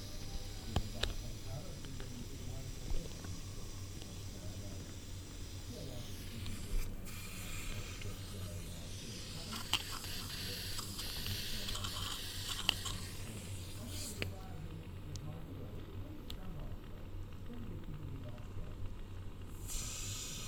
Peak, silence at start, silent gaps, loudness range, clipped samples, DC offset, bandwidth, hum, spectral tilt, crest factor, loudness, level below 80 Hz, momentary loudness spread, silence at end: -12 dBFS; 0 s; none; 9 LU; under 0.1%; under 0.1%; 19 kHz; none; -3.5 dB/octave; 30 dB; -44 LUFS; -48 dBFS; 9 LU; 0 s